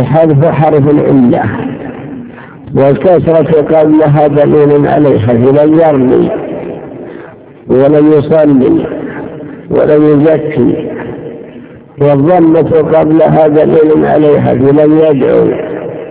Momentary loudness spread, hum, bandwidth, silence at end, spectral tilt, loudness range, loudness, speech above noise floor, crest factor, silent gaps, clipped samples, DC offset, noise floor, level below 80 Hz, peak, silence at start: 16 LU; none; 4 kHz; 0 s; -12.5 dB/octave; 4 LU; -7 LUFS; 24 dB; 8 dB; none; 4%; under 0.1%; -30 dBFS; -38 dBFS; 0 dBFS; 0 s